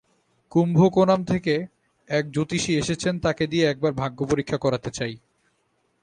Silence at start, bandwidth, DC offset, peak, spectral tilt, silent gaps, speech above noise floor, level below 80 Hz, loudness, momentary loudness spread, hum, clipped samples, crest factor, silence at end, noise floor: 0.55 s; 10 kHz; under 0.1%; -6 dBFS; -6 dB/octave; none; 47 dB; -52 dBFS; -23 LUFS; 10 LU; none; under 0.1%; 18 dB; 0.85 s; -69 dBFS